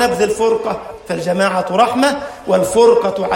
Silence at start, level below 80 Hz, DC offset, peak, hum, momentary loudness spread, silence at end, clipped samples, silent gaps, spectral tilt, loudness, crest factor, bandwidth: 0 s; -48 dBFS; under 0.1%; 0 dBFS; none; 12 LU; 0 s; under 0.1%; none; -4.5 dB/octave; -15 LUFS; 14 dB; 16.5 kHz